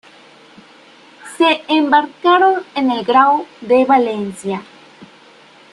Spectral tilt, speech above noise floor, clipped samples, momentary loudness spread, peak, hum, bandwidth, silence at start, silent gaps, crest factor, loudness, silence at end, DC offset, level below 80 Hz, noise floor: -4.5 dB/octave; 30 dB; under 0.1%; 12 LU; -2 dBFS; none; 12 kHz; 1.25 s; none; 16 dB; -14 LUFS; 0.65 s; under 0.1%; -64 dBFS; -45 dBFS